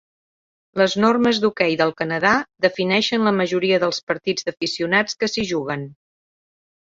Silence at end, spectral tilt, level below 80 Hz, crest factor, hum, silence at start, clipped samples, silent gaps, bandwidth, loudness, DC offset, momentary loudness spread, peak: 0.95 s; -4.5 dB/octave; -58 dBFS; 18 dB; none; 0.75 s; under 0.1%; 4.03-4.07 s; 7.8 kHz; -20 LUFS; under 0.1%; 7 LU; -2 dBFS